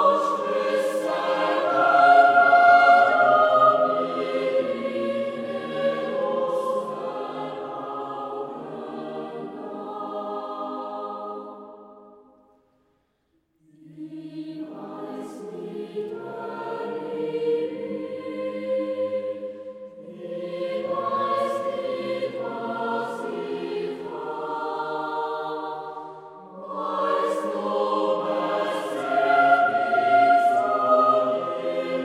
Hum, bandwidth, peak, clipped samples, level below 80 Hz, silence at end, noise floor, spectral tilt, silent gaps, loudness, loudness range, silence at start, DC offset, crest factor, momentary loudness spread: none; 12 kHz; -4 dBFS; under 0.1%; -76 dBFS; 0 s; -70 dBFS; -5 dB/octave; none; -23 LUFS; 19 LU; 0 s; under 0.1%; 20 dB; 18 LU